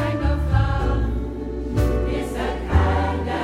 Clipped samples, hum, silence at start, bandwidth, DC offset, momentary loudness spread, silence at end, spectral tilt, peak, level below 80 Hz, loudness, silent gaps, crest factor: under 0.1%; none; 0 s; 13 kHz; under 0.1%; 6 LU; 0 s; -7.5 dB/octave; -6 dBFS; -24 dBFS; -23 LUFS; none; 16 dB